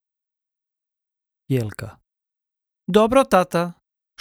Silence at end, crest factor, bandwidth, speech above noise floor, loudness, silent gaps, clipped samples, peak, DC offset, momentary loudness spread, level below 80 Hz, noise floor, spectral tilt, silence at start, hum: 0.5 s; 22 dB; 17 kHz; 68 dB; -20 LUFS; none; under 0.1%; -2 dBFS; under 0.1%; 20 LU; -52 dBFS; -86 dBFS; -6 dB/octave; 1.5 s; none